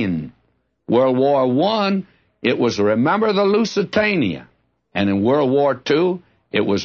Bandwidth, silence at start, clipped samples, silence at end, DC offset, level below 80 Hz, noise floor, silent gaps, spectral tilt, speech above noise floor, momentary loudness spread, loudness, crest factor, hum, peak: 7.2 kHz; 0 s; under 0.1%; 0 s; under 0.1%; -58 dBFS; -65 dBFS; none; -6.5 dB/octave; 48 dB; 8 LU; -18 LUFS; 14 dB; none; -4 dBFS